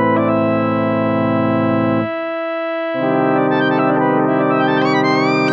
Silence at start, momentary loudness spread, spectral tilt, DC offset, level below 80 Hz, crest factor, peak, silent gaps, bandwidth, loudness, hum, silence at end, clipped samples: 0 s; 6 LU; -7.5 dB/octave; under 0.1%; -56 dBFS; 12 dB; -4 dBFS; none; 7.6 kHz; -16 LUFS; none; 0 s; under 0.1%